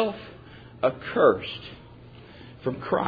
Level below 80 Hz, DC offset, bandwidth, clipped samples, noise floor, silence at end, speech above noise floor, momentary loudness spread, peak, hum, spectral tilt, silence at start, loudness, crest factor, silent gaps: -56 dBFS; under 0.1%; 5 kHz; under 0.1%; -47 dBFS; 0 s; 22 dB; 26 LU; -8 dBFS; none; -8.5 dB/octave; 0 s; -26 LUFS; 20 dB; none